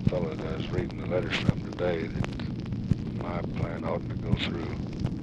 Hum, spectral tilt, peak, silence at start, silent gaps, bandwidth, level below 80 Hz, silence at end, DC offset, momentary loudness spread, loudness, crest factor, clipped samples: none; -7.5 dB/octave; -8 dBFS; 0 s; none; 8.4 kHz; -42 dBFS; 0 s; under 0.1%; 5 LU; -31 LUFS; 22 dB; under 0.1%